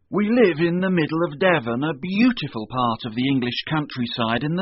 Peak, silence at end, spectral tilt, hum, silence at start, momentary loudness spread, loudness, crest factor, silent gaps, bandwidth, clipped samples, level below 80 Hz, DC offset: -4 dBFS; 0 s; -4.5 dB/octave; none; 0.1 s; 7 LU; -21 LUFS; 16 dB; none; 6 kHz; under 0.1%; -56 dBFS; under 0.1%